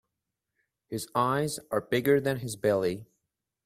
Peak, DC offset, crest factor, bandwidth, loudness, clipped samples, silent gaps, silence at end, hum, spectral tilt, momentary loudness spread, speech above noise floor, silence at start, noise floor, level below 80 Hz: -10 dBFS; under 0.1%; 20 dB; 16 kHz; -28 LUFS; under 0.1%; none; 0.6 s; none; -5.5 dB/octave; 11 LU; 58 dB; 0.9 s; -86 dBFS; -66 dBFS